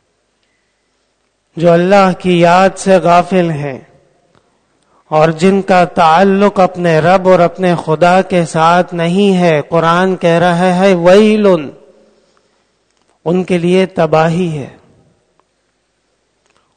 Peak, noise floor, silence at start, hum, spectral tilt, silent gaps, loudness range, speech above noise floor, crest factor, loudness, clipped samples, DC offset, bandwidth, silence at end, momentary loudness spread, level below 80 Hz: 0 dBFS; -61 dBFS; 1.55 s; none; -6.5 dB/octave; none; 6 LU; 52 dB; 12 dB; -10 LUFS; 0.6%; under 0.1%; 9.6 kHz; 2.05 s; 9 LU; -48 dBFS